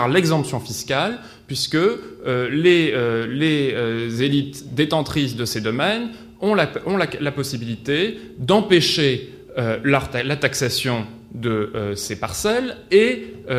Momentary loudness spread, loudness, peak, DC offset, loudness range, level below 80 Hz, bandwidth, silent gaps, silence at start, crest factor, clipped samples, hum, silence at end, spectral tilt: 11 LU; -20 LUFS; -2 dBFS; under 0.1%; 3 LU; -50 dBFS; 15.5 kHz; none; 0 s; 18 dB; under 0.1%; none; 0 s; -5 dB/octave